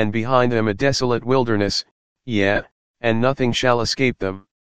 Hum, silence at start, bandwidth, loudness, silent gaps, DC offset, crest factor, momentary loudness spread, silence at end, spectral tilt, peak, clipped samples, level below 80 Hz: none; 0 s; 9.8 kHz; -20 LUFS; 1.91-2.16 s, 2.71-2.94 s; 2%; 18 dB; 7 LU; 0.1 s; -5 dB/octave; -2 dBFS; under 0.1%; -44 dBFS